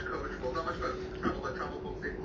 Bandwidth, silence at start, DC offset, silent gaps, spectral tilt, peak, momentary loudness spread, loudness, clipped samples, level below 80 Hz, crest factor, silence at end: 7.6 kHz; 0 s; under 0.1%; none; -6.5 dB/octave; -18 dBFS; 4 LU; -36 LUFS; under 0.1%; -48 dBFS; 18 dB; 0 s